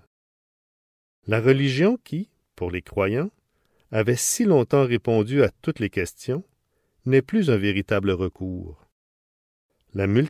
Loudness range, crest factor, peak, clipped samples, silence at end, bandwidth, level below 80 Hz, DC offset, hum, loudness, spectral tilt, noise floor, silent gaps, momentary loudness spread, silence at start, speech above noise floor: 3 LU; 18 dB; -6 dBFS; under 0.1%; 0 s; 16 kHz; -48 dBFS; under 0.1%; none; -23 LUFS; -5.5 dB/octave; -69 dBFS; 8.92-9.69 s; 14 LU; 1.25 s; 48 dB